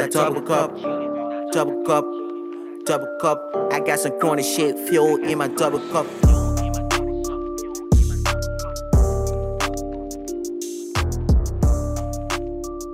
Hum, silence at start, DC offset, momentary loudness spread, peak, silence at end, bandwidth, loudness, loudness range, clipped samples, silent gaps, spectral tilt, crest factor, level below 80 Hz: none; 0 s; under 0.1%; 10 LU; -4 dBFS; 0 s; 16 kHz; -22 LUFS; 4 LU; under 0.1%; none; -5.5 dB/octave; 16 dB; -26 dBFS